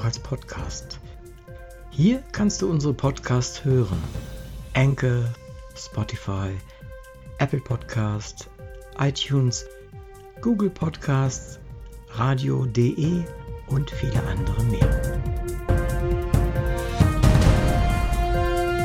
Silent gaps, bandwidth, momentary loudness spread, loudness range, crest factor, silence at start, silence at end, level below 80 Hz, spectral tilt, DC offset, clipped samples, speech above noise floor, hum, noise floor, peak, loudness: none; 15.5 kHz; 20 LU; 5 LU; 18 dB; 0 s; 0 s; -30 dBFS; -6.5 dB/octave; under 0.1%; under 0.1%; 19 dB; none; -42 dBFS; -6 dBFS; -24 LUFS